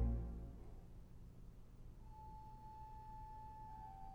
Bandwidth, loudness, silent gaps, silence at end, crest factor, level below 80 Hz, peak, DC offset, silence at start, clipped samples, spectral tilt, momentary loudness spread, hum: 6.6 kHz; -55 LUFS; none; 0 s; 20 dB; -52 dBFS; -30 dBFS; under 0.1%; 0 s; under 0.1%; -9 dB/octave; 11 LU; none